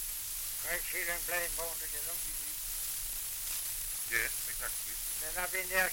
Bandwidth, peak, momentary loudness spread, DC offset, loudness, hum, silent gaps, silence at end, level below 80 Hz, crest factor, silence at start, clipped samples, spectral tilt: 17 kHz; -16 dBFS; 4 LU; under 0.1%; -34 LUFS; none; none; 0 s; -52 dBFS; 20 dB; 0 s; under 0.1%; 0.5 dB/octave